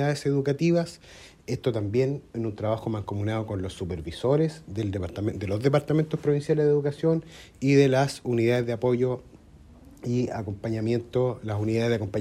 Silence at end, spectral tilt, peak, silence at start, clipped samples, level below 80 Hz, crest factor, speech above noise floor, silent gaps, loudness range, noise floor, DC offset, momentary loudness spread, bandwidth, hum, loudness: 0 s; -7.5 dB/octave; -8 dBFS; 0 s; under 0.1%; -54 dBFS; 18 dB; 25 dB; none; 5 LU; -51 dBFS; under 0.1%; 10 LU; 13.5 kHz; none; -26 LUFS